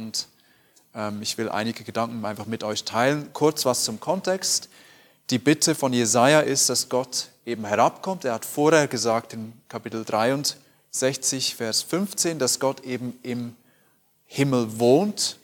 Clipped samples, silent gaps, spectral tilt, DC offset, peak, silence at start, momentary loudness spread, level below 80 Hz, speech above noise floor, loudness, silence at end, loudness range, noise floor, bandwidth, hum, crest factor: under 0.1%; none; -3.5 dB/octave; under 0.1%; -2 dBFS; 0 s; 13 LU; -72 dBFS; 39 dB; -23 LUFS; 0.1 s; 5 LU; -63 dBFS; 19 kHz; none; 22 dB